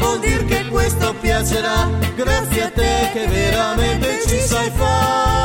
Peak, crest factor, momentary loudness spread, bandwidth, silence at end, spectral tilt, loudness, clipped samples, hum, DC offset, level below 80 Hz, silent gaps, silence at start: -4 dBFS; 12 dB; 2 LU; 17 kHz; 0 s; -4.5 dB/octave; -17 LUFS; under 0.1%; none; under 0.1%; -24 dBFS; none; 0 s